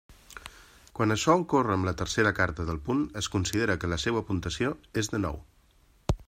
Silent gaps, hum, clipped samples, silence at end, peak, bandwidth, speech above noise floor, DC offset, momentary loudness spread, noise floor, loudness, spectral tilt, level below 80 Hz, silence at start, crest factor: none; none; under 0.1%; 0.05 s; -10 dBFS; 16 kHz; 34 dB; under 0.1%; 19 LU; -62 dBFS; -28 LUFS; -5 dB/octave; -46 dBFS; 0.1 s; 20 dB